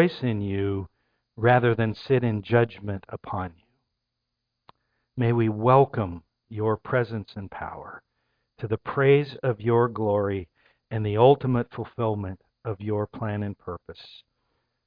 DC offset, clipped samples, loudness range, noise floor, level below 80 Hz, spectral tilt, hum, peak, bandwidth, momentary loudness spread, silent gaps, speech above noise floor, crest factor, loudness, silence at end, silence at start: under 0.1%; under 0.1%; 6 LU; -82 dBFS; -56 dBFS; -10 dB/octave; none; -4 dBFS; 5.2 kHz; 18 LU; none; 57 dB; 22 dB; -25 LUFS; 0.8 s; 0 s